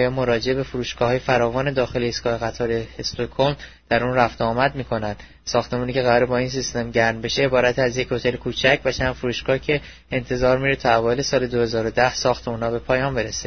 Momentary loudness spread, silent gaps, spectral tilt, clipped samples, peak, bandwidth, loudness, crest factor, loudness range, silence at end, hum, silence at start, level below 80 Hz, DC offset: 7 LU; none; -5 dB/octave; under 0.1%; -2 dBFS; 6.6 kHz; -21 LUFS; 20 dB; 2 LU; 0 s; none; 0 s; -42 dBFS; 0.4%